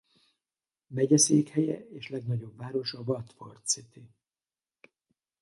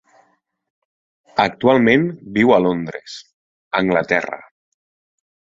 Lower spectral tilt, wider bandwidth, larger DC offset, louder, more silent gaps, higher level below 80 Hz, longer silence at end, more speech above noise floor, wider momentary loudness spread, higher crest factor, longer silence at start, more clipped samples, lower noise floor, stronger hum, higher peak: second, -4.5 dB/octave vs -6.5 dB/octave; first, 11.5 kHz vs 7.6 kHz; neither; second, -29 LUFS vs -17 LUFS; second, none vs 3.34-3.71 s; second, -72 dBFS vs -56 dBFS; first, 1.35 s vs 1.05 s; first, over 61 dB vs 45 dB; about the same, 16 LU vs 18 LU; about the same, 22 dB vs 18 dB; second, 0.9 s vs 1.35 s; neither; first, under -90 dBFS vs -62 dBFS; neither; second, -10 dBFS vs -2 dBFS